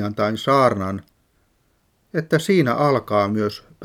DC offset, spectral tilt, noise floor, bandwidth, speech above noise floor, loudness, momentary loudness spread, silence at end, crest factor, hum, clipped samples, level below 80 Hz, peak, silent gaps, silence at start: under 0.1%; -6.5 dB/octave; -64 dBFS; 16.5 kHz; 44 dB; -20 LUFS; 11 LU; 0 s; 18 dB; none; under 0.1%; -60 dBFS; -4 dBFS; none; 0 s